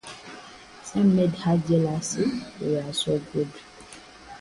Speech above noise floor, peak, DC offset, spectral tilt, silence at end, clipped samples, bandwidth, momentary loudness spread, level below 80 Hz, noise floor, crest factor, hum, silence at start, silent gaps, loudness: 22 dB; -10 dBFS; under 0.1%; -6 dB/octave; 0 s; under 0.1%; 11.5 kHz; 23 LU; -56 dBFS; -46 dBFS; 16 dB; none; 0.05 s; none; -25 LUFS